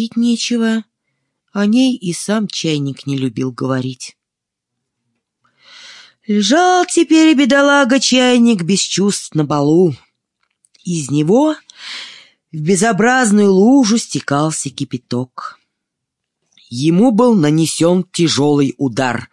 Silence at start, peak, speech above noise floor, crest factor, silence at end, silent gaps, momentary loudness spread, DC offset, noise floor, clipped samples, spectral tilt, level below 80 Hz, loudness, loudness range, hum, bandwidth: 0 s; -2 dBFS; 67 dB; 12 dB; 0.05 s; none; 16 LU; under 0.1%; -80 dBFS; under 0.1%; -4.5 dB/octave; -60 dBFS; -14 LUFS; 9 LU; none; 12 kHz